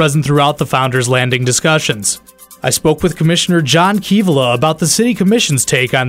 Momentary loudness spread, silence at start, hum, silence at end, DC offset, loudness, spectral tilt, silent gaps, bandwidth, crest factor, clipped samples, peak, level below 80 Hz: 3 LU; 0 s; none; 0 s; under 0.1%; -12 LUFS; -4 dB/octave; none; 16.5 kHz; 12 dB; under 0.1%; 0 dBFS; -44 dBFS